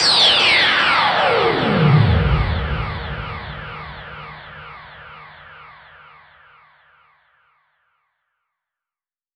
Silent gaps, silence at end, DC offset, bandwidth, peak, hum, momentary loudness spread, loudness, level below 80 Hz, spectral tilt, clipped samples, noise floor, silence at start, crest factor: none; 3.65 s; under 0.1%; 10 kHz; -2 dBFS; none; 25 LU; -15 LUFS; -32 dBFS; -4.5 dB/octave; under 0.1%; under -90 dBFS; 0 s; 18 dB